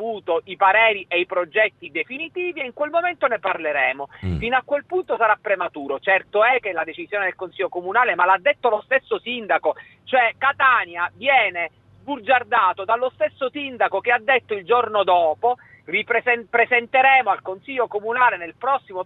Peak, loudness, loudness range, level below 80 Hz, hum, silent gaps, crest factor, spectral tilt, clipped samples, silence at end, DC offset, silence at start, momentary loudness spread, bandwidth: -4 dBFS; -20 LUFS; 3 LU; -50 dBFS; none; none; 16 dB; -7 dB/octave; under 0.1%; 0 s; under 0.1%; 0 s; 10 LU; 4.3 kHz